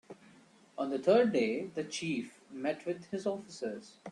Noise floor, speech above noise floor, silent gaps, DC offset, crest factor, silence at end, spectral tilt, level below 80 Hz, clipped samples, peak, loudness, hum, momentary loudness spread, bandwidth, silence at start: -61 dBFS; 28 dB; none; under 0.1%; 20 dB; 0 s; -5 dB/octave; -78 dBFS; under 0.1%; -14 dBFS; -34 LUFS; none; 14 LU; 11 kHz; 0.1 s